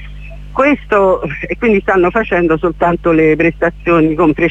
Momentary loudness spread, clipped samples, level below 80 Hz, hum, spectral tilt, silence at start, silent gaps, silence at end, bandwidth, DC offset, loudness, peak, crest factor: 6 LU; under 0.1%; -32 dBFS; 50 Hz at -30 dBFS; -8.5 dB/octave; 0 s; none; 0 s; 7.8 kHz; under 0.1%; -13 LUFS; 0 dBFS; 12 dB